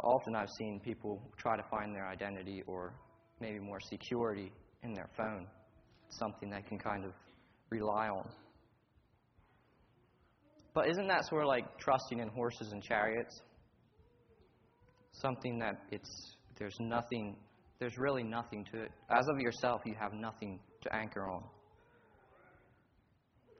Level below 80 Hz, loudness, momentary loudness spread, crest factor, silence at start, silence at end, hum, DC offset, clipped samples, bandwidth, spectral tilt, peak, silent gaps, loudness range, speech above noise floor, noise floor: -70 dBFS; -39 LUFS; 14 LU; 24 dB; 0 s; 2 s; none; under 0.1%; under 0.1%; 6.4 kHz; -4 dB/octave; -16 dBFS; none; 8 LU; 34 dB; -73 dBFS